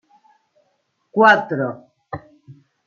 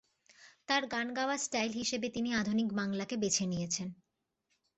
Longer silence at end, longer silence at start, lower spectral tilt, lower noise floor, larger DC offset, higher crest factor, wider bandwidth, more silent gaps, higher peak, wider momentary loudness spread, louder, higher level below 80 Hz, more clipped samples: second, 0.35 s vs 0.85 s; first, 1.15 s vs 0.4 s; first, -6 dB/octave vs -3.5 dB/octave; second, -68 dBFS vs -82 dBFS; neither; about the same, 20 dB vs 20 dB; second, 7.4 kHz vs 8.2 kHz; neither; first, -2 dBFS vs -16 dBFS; first, 22 LU vs 5 LU; first, -16 LUFS vs -34 LUFS; first, -64 dBFS vs -70 dBFS; neither